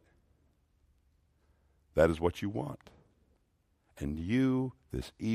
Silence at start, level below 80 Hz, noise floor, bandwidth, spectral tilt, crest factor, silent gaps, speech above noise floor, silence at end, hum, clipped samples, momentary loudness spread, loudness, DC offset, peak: 1.95 s; -54 dBFS; -74 dBFS; 14.5 kHz; -7.5 dB/octave; 24 dB; none; 42 dB; 0 s; none; under 0.1%; 14 LU; -33 LUFS; under 0.1%; -10 dBFS